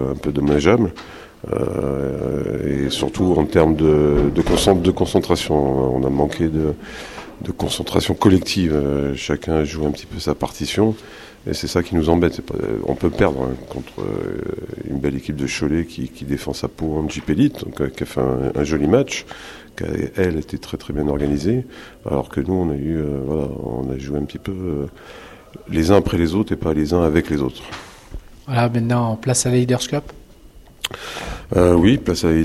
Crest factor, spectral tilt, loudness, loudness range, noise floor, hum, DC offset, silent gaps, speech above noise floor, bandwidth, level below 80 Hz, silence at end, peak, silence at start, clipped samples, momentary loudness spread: 20 dB; -6 dB/octave; -20 LUFS; 6 LU; -44 dBFS; none; under 0.1%; none; 25 dB; 15.5 kHz; -36 dBFS; 0 s; 0 dBFS; 0 s; under 0.1%; 15 LU